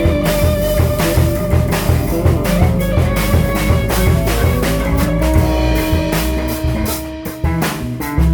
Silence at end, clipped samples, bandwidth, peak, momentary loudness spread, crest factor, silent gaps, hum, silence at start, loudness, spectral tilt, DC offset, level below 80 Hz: 0 s; under 0.1%; over 20 kHz; -2 dBFS; 5 LU; 14 dB; none; none; 0 s; -16 LUFS; -6 dB/octave; under 0.1%; -20 dBFS